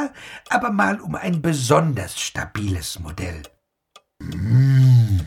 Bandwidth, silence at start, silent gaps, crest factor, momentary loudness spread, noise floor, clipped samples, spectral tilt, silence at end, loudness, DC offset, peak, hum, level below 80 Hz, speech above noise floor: 14.5 kHz; 0 s; none; 16 dB; 17 LU; -55 dBFS; under 0.1%; -6 dB/octave; 0 s; -20 LUFS; under 0.1%; -4 dBFS; none; -42 dBFS; 34 dB